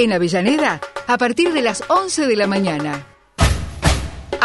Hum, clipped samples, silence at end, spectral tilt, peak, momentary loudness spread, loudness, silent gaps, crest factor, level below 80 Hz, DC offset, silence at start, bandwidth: none; under 0.1%; 0 s; -4.5 dB/octave; -2 dBFS; 9 LU; -18 LUFS; none; 16 dB; -30 dBFS; under 0.1%; 0 s; 12 kHz